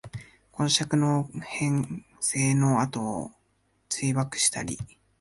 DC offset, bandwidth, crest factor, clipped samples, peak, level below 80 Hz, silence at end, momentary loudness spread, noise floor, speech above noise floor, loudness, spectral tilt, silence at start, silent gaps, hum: under 0.1%; 11.5 kHz; 20 dB; under 0.1%; -8 dBFS; -58 dBFS; 0.35 s; 17 LU; -69 dBFS; 43 dB; -26 LUFS; -4 dB/octave; 0.05 s; none; none